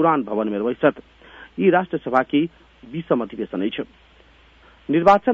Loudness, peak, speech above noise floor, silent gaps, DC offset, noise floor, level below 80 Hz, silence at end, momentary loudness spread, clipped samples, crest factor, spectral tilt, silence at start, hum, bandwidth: -21 LUFS; -2 dBFS; 32 dB; none; under 0.1%; -52 dBFS; -56 dBFS; 0 s; 15 LU; under 0.1%; 18 dB; -8 dB/octave; 0 s; none; 7.6 kHz